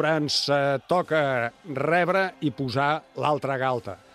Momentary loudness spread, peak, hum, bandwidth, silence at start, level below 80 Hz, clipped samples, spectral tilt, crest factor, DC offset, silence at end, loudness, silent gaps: 7 LU; -8 dBFS; none; 13.5 kHz; 0 s; -64 dBFS; under 0.1%; -5 dB/octave; 16 dB; under 0.1%; 0.2 s; -25 LUFS; none